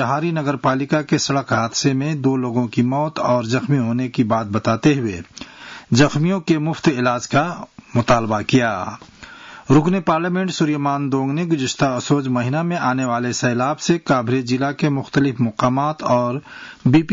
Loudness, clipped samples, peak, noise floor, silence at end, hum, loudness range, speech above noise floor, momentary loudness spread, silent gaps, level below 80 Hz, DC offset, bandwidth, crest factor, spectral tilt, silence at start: -19 LUFS; under 0.1%; -4 dBFS; -39 dBFS; 0 s; none; 1 LU; 21 dB; 7 LU; none; -50 dBFS; under 0.1%; 7.8 kHz; 14 dB; -6 dB/octave; 0 s